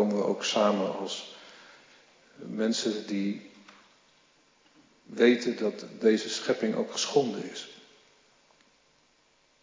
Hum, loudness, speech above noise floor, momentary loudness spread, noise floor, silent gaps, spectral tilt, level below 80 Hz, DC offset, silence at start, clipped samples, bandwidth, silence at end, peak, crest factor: none; -28 LUFS; 38 dB; 18 LU; -66 dBFS; none; -4 dB/octave; -86 dBFS; under 0.1%; 0 s; under 0.1%; 7.6 kHz; 1.85 s; -10 dBFS; 22 dB